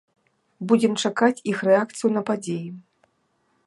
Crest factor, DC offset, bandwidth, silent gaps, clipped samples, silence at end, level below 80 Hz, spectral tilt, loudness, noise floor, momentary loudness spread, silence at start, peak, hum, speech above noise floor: 18 dB; under 0.1%; 11.5 kHz; none; under 0.1%; 0.85 s; -76 dBFS; -5 dB/octave; -22 LUFS; -69 dBFS; 11 LU; 0.6 s; -4 dBFS; none; 47 dB